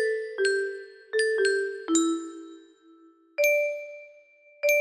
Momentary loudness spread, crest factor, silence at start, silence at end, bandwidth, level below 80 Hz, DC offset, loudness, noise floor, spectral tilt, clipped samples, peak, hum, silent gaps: 18 LU; 16 dB; 0 s; 0 s; 13 kHz; -78 dBFS; under 0.1%; -26 LUFS; -56 dBFS; -0.5 dB/octave; under 0.1%; -10 dBFS; none; none